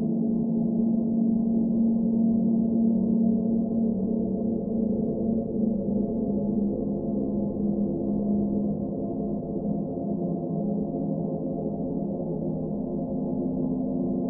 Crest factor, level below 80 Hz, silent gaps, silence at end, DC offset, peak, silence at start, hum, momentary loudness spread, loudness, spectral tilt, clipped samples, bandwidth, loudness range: 12 dB; -48 dBFS; none; 0 s; under 0.1%; -14 dBFS; 0 s; none; 6 LU; -27 LUFS; -17 dB/octave; under 0.1%; 1.2 kHz; 5 LU